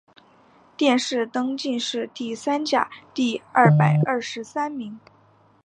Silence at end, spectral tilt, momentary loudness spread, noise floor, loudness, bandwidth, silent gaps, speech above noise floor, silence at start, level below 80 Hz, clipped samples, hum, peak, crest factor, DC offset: 0.65 s; -6 dB/octave; 12 LU; -57 dBFS; -22 LUFS; 9.6 kHz; none; 35 dB; 0.8 s; -70 dBFS; under 0.1%; none; -2 dBFS; 22 dB; under 0.1%